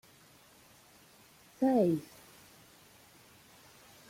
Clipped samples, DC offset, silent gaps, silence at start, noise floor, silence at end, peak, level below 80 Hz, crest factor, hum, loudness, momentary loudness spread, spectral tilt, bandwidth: under 0.1%; under 0.1%; none; 1.6 s; -61 dBFS; 2.1 s; -16 dBFS; -74 dBFS; 20 dB; none; -30 LUFS; 29 LU; -7 dB/octave; 16.5 kHz